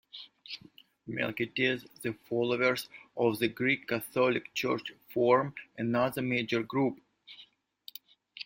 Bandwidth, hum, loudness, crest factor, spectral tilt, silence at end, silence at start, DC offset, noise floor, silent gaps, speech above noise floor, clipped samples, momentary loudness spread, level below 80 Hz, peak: 16.5 kHz; none; -31 LUFS; 20 dB; -5.5 dB/octave; 0.05 s; 0.15 s; under 0.1%; -59 dBFS; none; 28 dB; under 0.1%; 20 LU; -70 dBFS; -12 dBFS